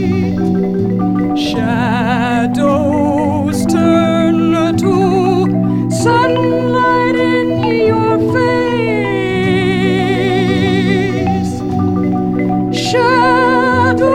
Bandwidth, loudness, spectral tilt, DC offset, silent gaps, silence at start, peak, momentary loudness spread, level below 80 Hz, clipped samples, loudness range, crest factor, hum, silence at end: 14 kHz; -13 LUFS; -6.5 dB/octave; under 0.1%; none; 0 s; 0 dBFS; 4 LU; -38 dBFS; under 0.1%; 2 LU; 12 dB; none; 0 s